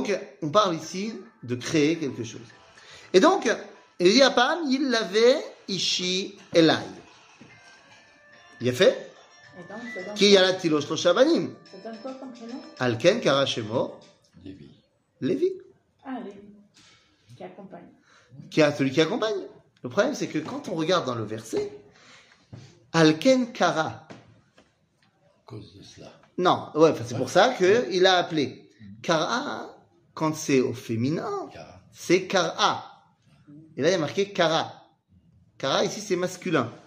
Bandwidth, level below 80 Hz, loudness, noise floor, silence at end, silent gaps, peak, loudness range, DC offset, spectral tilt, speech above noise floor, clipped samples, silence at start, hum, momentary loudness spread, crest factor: 15.5 kHz; -70 dBFS; -24 LUFS; -66 dBFS; 0.1 s; none; -4 dBFS; 7 LU; under 0.1%; -4.5 dB/octave; 42 dB; under 0.1%; 0 s; none; 20 LU; 22 dB